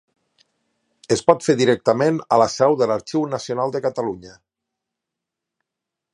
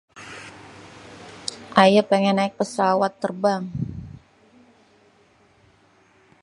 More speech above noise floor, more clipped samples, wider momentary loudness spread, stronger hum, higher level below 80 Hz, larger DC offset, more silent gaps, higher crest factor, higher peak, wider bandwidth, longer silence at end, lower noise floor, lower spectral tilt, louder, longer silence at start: first, 65 dB vs 38 dB; neither; second, 8 LU vs 27 LU; neither; about the same, -60 dBFS vs -56 dBFS; neither; neither; about the same, 20 dB vs 24 dB; about the same, 0 dBFS vs 0 dBFS; about the same, 11.5 kHz vs 11.5 kHz; second, 1.85 s vs 2.25 s; first, -84 dBFS vs -57 dBFS; about the same, -5 dB/octave vs -5.5 dB/octave; about the same, -19 LUFS vs -21 LUFS; first, 1.1 s vs 0.15 s